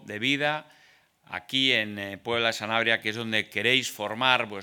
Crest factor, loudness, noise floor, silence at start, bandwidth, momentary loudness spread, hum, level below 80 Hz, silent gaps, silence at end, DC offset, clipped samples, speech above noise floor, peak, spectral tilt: 24 dB; -25 LUFS; -60 dBFS; 0.05 s; 19 kHz; 10 LU; none; -74 dBFS; none; 0 s; under 0.1%; under 0.1%; 33 dB; -4 dBFS; -3 dB/octave